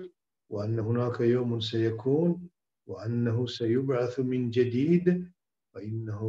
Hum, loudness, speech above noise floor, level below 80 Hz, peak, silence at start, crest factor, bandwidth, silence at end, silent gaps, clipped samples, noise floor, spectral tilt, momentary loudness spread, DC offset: none; -28 LUFS; 22 dB; -68 dBFS; -12 dBFS; 0 s; 16 dB; 7.6 kHz; 0 s; none; under 0.1%; -49 dBFS; -8.5 dB/octave; 13 LU; under 0.1%